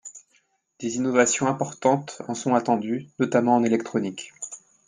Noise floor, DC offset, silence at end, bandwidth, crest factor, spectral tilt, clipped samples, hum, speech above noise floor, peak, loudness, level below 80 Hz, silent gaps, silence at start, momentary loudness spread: -66 dBFS; under 0.1%; 0.3 s; 9.8 kHz; 18 dB; -4.5 dB/octave; under 0.1%; none; 43 dB; -6 dBFS; -24 LUFS; -70 dBFS; none; 0.05 s; 15 LU